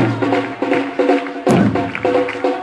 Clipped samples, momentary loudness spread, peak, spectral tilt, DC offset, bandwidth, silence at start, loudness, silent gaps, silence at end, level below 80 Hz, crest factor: under 0.1%; 4 LU; -2 dBFS; -7 dB/octave; under 0.1%; 11 kHz; 0 s; -17 LUFS; none; 0 s; -50 dBFS; 14 dB